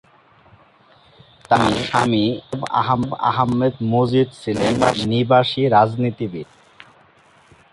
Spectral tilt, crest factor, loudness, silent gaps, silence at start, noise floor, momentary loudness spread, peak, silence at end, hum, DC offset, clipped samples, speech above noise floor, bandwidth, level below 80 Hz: -6.5 dB/octave; 18 dB; -18 LUFS; none; 1.5 s; -52 dBFS; 8 LU; -2 dBFS; 1.3 s; none; under 0.1%; under 0.1%; 34 dB; 11.5 kHz; -50 dBFS